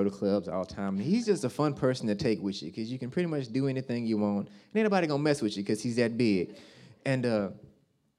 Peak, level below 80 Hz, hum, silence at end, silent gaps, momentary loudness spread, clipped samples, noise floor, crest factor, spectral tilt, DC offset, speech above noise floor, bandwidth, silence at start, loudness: -12 dBFS; -64 dBFS; none; 0.55 s; none; 8 LU; under 0.1%; -65 dBFS; 18 dB; -6.5 dB/octave; under 0.1%; 36 dB; 12.5 kHz; 0 s; -30 LUFS